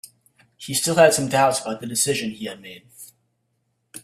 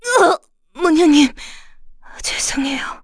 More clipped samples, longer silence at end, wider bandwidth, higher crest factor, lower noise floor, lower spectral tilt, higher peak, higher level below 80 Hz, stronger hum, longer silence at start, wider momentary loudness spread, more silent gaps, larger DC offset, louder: neither; about the same, 0.05 s vs 0.05 s; first, 16 kHz vs 11 kHz; first, 22 dB vs 16 dB; first, -72 dBFS vs -38 dBFS; about the same, -3 dB/octave vs -2 dB/octave; about the same, -2 dBFS vs -2 dBFS; second, -62 dBFS vs -42 dBFS; neither; first, 0.6 s vs 0.05 s; first, 24 LU vs 13 LU; neither; neither; second, -20 LUFS vs -16 LUFS